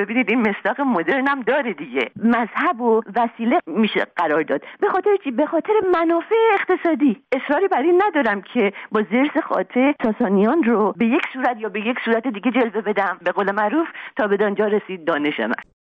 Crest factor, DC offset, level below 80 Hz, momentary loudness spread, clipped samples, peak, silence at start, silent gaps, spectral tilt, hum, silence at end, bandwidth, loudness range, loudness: 12 dB; under 0.1%; -66 dBFS; 6 LU; under 0.1%; -6 dBFS; 0 s; none; -8 dB/octave; none; 0.25 s; 5.4 kHz; 2 LU; -20 LUFS